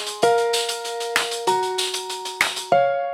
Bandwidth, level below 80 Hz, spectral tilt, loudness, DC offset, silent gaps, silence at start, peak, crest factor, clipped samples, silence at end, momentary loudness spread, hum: 17 kHz; -72 dBFS; -1.5 dB/octave; -21 LUFS; under 0.1%; none; 0 s; -2 dBFS; 20 dB; under 0.1%; 0 s; 7 LU; none